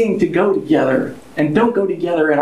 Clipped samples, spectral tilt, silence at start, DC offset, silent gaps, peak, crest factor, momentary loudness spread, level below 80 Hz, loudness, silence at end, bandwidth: under 0.1%; -7.5 dB/octave; 0 s; under 0.1%; none; -2 dBFS; 14 dB; 5 LU; -52 dBFS; -16 LUFS; 0 s; 11.5 kHz